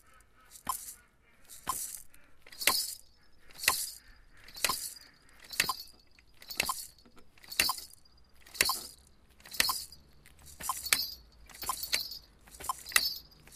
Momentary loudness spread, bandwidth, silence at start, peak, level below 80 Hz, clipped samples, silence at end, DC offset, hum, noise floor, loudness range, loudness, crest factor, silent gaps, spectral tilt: 21 LU; 15.5 kHz; 0.15 s; -6 dBFS; -60 dBFS; under 0.1%; 0 s; under 0.1%; none; -61 dBFS; 3 LU; -32 LUFS; 32 dB; none; 1 dB/octave